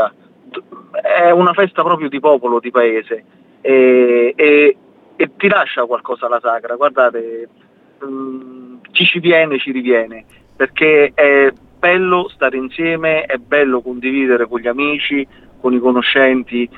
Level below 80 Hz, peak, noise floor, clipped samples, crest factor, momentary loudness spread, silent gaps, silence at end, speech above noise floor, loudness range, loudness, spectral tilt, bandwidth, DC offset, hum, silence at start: -56 dBFS; 0 dBFS; -37 dBFS; under 0.1%; 14 dB; 16 LU; none; 0.1 s; 23 dB; 4 LU; -13 LUFS; -7.5 dB/octave; 4.4 kHz; under 0.1%; none; 0 s